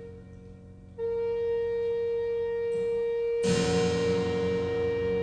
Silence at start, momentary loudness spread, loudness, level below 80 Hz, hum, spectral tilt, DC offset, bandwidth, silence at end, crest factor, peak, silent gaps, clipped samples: 0 s; 20 LU; -28 LUFS; -54 dBFS; none; -5.5 dB/octave; under 0.1%; 10 kHz; 0 s; 14 dB; -14 dBFS; none; under 0.1%